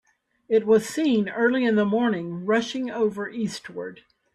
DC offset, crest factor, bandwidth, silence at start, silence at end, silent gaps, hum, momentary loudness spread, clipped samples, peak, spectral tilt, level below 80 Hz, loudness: under 0.1%; 14 dB; 13.5 kHz; 0.5 s; 0.4 s; none; none; 11 LU; under 0.1%; -10 dBFS; -5.5 dB/octave; -68 dBFS; -23 LUFS